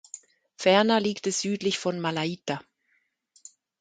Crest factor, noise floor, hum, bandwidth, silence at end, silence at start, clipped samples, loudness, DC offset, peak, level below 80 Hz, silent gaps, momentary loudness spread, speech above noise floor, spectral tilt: 20 dB; -72 dBFS; none; 9.6 kHz; 1.2 s; 0.6 s; under 0.1%; -26 LUFS; under 0.1%; -6 dBFS; -72 dBFS; none; 14 LU; 47 dB; -4 dB/octave